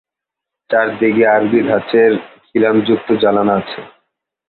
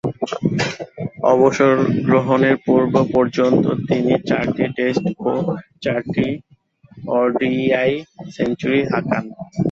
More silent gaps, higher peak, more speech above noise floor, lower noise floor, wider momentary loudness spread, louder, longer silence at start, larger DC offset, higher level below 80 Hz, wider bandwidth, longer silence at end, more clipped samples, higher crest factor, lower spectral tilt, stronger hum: neither; about the same, -2 dBFS vs -2 dBFS; first, 70 dB vs 33 dB; first, -83 dBFS vs -50 dBFS; about the same, 9 LU vs 9 LU; first, -14 LUFS vs -18 LUFS; first, 0.7 s vs 0.05 s; neither; about the same, -56 dBFS vs -52 dBFS; second, 4.4 kHz vs 7.8 kHz; first, 0.6 s vs 0 s; neither; about the same, 14 dB vs 16 dB; first, -10.5 dB/octave vs -7 dB/octave; neither